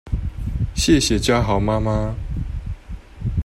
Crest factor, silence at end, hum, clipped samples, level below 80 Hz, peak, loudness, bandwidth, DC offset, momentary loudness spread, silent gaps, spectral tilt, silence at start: 16 dB; 0 s; none; under 0.1%; -28 dBFS; -4 dBFS; -21 LUFS; 16 kHz; under 0.1%; 15 LU; none; -5 dB/octave; 0.05 s